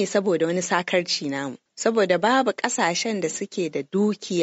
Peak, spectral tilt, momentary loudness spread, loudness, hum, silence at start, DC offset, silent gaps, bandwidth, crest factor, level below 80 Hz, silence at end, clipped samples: -4 dBFS; -3.5 dB/octave; 8 LU; -23 LUFS; none; 0 s; under 0.1%; none; 8.2 kHz; 18 dB; -72 dBFS; 0 s; under 0.1%